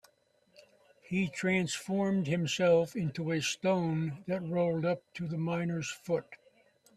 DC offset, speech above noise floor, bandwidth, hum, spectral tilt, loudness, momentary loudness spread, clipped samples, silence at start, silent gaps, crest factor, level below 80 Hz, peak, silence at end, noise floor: under 0.1%; 38 dB; 13.5 kHz; none; -5.5 dB/octave; -32 LUFS; 8 LU; under 0.1%; 1.1 s; none; 16 dB; -70 dBFS; -16 dBFS; 0.6 s; -70 dBFS